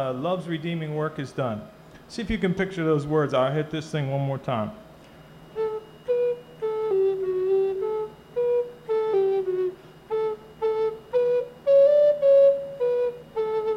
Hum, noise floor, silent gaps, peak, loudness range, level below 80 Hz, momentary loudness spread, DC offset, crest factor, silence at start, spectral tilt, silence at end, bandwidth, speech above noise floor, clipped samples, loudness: none; -48 dBFS; none; -10 dBFS; 7 LU; -54 dBFS; 13 LU; under 0.1%; 14 dB; 0 s; -7.5 dB/octave; 0 s; 10 kHz; 22 dB; under 0.1%; -25 LUFS